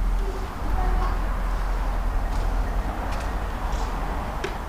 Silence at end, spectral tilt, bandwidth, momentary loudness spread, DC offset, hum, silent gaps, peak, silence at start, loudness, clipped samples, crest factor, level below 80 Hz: 0 s; -6 dB/octave; 15 kHz; 3 LU; under 0.1%; none; none; -12 dBFS; 0 s; -29 LUFS; under 0.1%; 12 dB; -26 dBFS